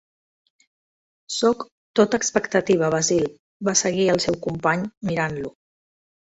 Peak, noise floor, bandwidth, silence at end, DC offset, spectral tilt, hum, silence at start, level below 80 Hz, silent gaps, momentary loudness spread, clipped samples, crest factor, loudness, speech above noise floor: -4 dBFS; under -90 dBFS; 8.4 kHz; 0.7 s; under 0.1%; -4 dB/octave; none; 1.3 s; -56 dBFS; 1.72-1.94 s, 3.39-3.60 s, 4.97-5.01 s; 9 LU; under 0.1%; 20 dB; -22 LUFS; over 69 dB